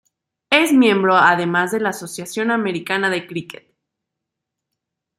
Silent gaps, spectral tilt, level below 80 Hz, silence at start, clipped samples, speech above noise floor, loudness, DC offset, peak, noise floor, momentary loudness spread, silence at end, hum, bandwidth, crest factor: none; -4.5 dB/octave; -68 dBFS; 0.5 s; under 0.1%; 64 dB; -17 LUFS; under 0.1%; -2 dBFS; -81 dBFS; 15 LU; 1.75 s; none; 15.5 kHz; 18 dB